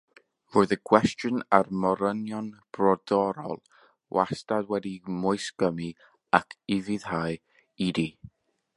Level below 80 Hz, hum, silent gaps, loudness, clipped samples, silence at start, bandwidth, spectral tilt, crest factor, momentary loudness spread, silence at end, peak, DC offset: -60 dBFS; none; none; -27 LUFS; under 0.1%; 0.55 s; 11.5 kHz; -6 dB/octave; 26 dB; 12 LU; 0.5 s; -2 dBFS; under 0.1%